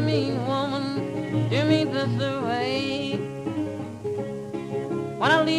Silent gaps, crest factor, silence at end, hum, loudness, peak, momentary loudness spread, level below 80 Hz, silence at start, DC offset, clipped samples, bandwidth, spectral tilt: none; 16 dB; 0 s; none; -26 LUFS; -8 dBFS; 10 LU; -60 dBFS; 0 s; under 0.1%; under 0.1%; 12 kHz; -6.5 dB/octave